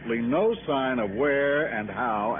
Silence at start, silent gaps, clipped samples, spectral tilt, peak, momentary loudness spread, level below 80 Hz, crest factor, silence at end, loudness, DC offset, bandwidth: 0 s; none; under 0.1%; -1.5 dB/octave; -14 dBFS; 4 LU; -54 dBFS; 12 dB; 0 s; -25 LUFS; under 0.1%; 3.7 kHz